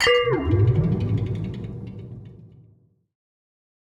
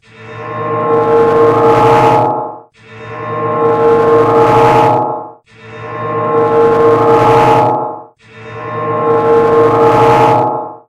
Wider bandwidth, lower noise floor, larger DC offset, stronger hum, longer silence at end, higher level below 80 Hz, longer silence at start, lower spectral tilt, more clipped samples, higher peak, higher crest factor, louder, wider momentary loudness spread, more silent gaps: about the same, 11.5 kHz vs 10.5 kHz; first, -58 dBFS vs -33 dBFS; neither; neither; first, 1.45 s vs 0.1 s; about the same, -42 dBFS vs -42 dBFS; second, 0 s vs 0.2 s; about the same, -6 dB/octave vs -7 dB/octave; second, under 0.1% vs 0.2%; second, -8 dBFS vs 0 dBFS; first, 18 dB vs 10 dB; second, -22 LUFS vs -10 LUFS; first, 19 LU vs 16 LU; neither